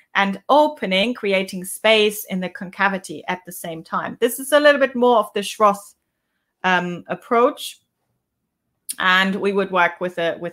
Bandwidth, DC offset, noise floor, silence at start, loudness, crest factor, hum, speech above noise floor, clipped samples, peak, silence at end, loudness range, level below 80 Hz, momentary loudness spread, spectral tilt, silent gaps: 16 kHz; under 0.1%; -76 dBFS; 0.15 s; -19 LUFS; 20 dB; none; 57 dB; under 0.1%; 0 dBFS; 0 s; 3 LU; -68 dBFS; 13 LU; -4 dB/octave; none